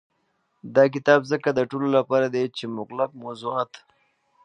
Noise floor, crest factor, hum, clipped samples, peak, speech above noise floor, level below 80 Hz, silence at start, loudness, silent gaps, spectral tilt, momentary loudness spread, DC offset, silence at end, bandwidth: -71 dBFS; 22 dB; none; under 0.1%; -2 dBFS; 48 dB; -72 dBFS; 0.65 s; -23 LUFS; none; -6.5 dB/octave; 12 LU; under 0.1%; 0.8 s; 9 kHz